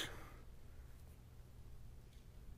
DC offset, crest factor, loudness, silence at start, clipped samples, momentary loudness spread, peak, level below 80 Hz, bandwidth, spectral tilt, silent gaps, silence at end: under 0.1%; 22 dB; -58 LUFS; 0 s; under 0.1%; 4 LU; -32 dBFS; -58 dBFS; 15.5 kHz; -3.5 dB/octave; none; 0 s